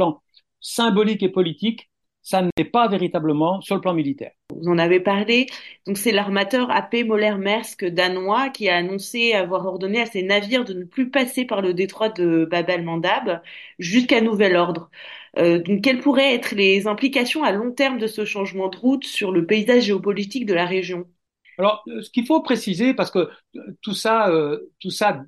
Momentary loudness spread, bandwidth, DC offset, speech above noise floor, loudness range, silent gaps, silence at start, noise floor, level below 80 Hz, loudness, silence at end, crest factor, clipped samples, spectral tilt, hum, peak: 11 LU; 12.5 kHz; under 0.1%; 32 dB; 3 LU; 2.52-2.57 s; 0 s; -52 dBFS; -66 dBFS; -20 LUFS; 0.05 s; 18 dB; under 0.1%; -5 dB/octave; none; -4 dBFS